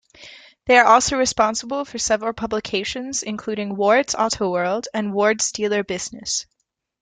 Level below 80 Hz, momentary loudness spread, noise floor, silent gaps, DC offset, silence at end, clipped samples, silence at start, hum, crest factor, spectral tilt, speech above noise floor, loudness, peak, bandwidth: -52 dBFS; 12 LU; -45 dBFS; none; under 0.1%; 0.6 s; under 0.1%; 0.2 s; none; 20 dB; -2.5 dB/octave; 24 dB; -20 LUFS; -2 dBFS; 10 kHz